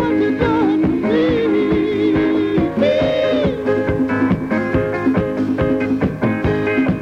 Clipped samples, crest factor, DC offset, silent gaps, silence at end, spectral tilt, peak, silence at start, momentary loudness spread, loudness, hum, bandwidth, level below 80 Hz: under 0.1%; 12 dB; under 0.1%; none; 0 s; -8 dB/octave; -4 dBFS; 0 s; 3 LU; -17 LUFS; none; 7.2 kHz; -36 dBFS